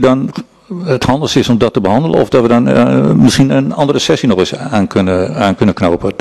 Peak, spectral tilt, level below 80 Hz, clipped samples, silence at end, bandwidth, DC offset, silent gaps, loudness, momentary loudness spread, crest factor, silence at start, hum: 0 dBFS; -6 dB/octave; -38 dBFS; under 0.1%; 0.05 s; 13 kHz; 0.4%; none; -11 LUFS; 6 LU; 10 dB; 0 s; none